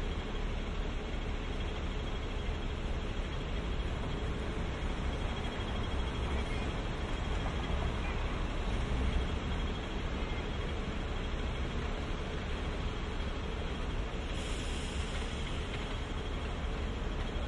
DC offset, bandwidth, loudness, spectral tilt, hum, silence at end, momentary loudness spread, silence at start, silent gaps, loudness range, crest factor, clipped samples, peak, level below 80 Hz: under 0.1%; 11 kHz; -38 LUFS; -5.5 dB/octave; none; 0 s; 3 LU; 0 s; none; 2 LU; 14 dB; under 0.1%; -20 dBFS; -38 dBFS